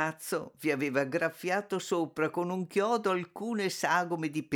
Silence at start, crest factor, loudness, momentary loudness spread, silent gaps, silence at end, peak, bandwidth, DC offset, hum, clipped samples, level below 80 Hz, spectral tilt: 0 s; 18 dB; -31 LUFS; 5 LU; none; 0 s; -14 dBFS; 19.5 kHz; under 0.1%; none; under 0.1%; -78 dBFS; -5 dB/octave